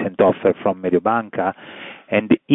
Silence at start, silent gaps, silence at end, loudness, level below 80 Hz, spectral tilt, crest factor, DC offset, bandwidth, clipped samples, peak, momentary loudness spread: 0 s; none; 0 s; -19 LUFS; -60 dBFS; -9.5 dB/octave; 16 dB; under 0.1%; 3.9 kHz; under 0.1%; -2 dBFS; 17 LU